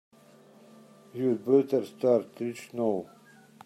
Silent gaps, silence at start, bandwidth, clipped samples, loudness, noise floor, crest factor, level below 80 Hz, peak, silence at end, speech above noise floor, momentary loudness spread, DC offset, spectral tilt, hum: none; 1.15 s; 14 kHz; under 0.1%; -28 LUFS; -56 dBFS; 20 dB; -80 dBFS; -10 dBFS; 0.6 s; 29 dB; 12 LU; under 0.1%; -7.5 dB/octave; none